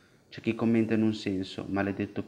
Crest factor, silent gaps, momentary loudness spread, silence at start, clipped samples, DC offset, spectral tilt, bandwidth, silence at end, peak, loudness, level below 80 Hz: 16 dB; none; 9 LU; 0.3 s; under 0.1%; under 0.1%; -7 dB/octave; 9.6 kHz; 0 s; -12 dBFS; -29 LUFS; -66 dBFS